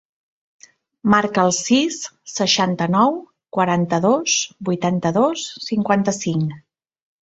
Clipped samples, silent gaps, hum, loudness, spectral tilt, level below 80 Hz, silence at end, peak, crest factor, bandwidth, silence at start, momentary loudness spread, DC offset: under 0.1%; none; none; -19 LUFS; -4 dB/octave; -60 dBFS; 0.65 s; -2 dBFS; 18 dB; 8.2 kHz; 1.05 s; 9 LU; under 0.1%